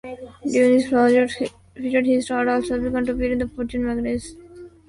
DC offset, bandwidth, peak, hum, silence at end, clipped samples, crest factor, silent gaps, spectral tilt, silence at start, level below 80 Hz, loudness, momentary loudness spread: under 0.1%; 11.5 kHz; -4 dBFS; none; 0.2 s; under 0.1%; 16 dB; none; -5.5 dB/octave; 0.05 s; -44 dBFS; -21 LUFS; 13 LU